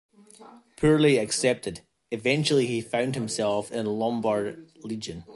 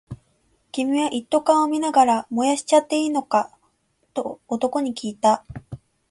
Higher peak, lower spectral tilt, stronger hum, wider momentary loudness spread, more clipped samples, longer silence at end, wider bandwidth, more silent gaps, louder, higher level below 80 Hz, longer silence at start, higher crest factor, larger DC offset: second, -8 dBFS vs -4 dBFS; about the same, -5 dB/octave vs -4 dB/octave; neither; second, 15 LU vs 20 LU; neither; second, 0 s vs 0.35 s; about the same, 11.5 kHz vs 11.5 kHz; neither; second, -25 LUFS vs -21 LUFS; about the same, -56 dBFS vs -58 dBFS; first, 0.4 s vs 0.1 s; about the same, 18 dB vs 18 dB; neither